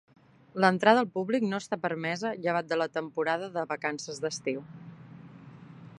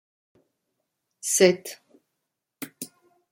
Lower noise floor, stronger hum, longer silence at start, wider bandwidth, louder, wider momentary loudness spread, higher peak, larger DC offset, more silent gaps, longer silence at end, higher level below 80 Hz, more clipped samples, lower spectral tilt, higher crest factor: second, -49 dBFS vs -82 dBFS; neither; second, 0.55 s vs 1.25 s; second, 11.5 kHz vs 16.5 kHz; second, -29 LUFS vs -22 LUFS; first, 26 LU vs 22 LU; about the same, -6 dBFS vs -4 dBFS; neither; neither; second, 0 s vs 0.45 s; about the same, -76 dBFS vs -76 dBFS; neither; first, -5 dB/octave vs -3 dB/octave; about the same, 24 dB vs 26 dB